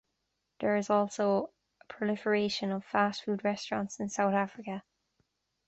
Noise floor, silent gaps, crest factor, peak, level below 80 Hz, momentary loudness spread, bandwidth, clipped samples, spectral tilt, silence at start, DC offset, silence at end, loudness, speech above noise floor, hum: -82 dBFS; none; 20 dB; -14 dBFS; -72 dBFS; 11 LU; 8.2 kHz; under 0.1%; -5 dB/octave; 0.6 s; under 0.1%; 0.85 s; -31 LUFS; 51 dB; none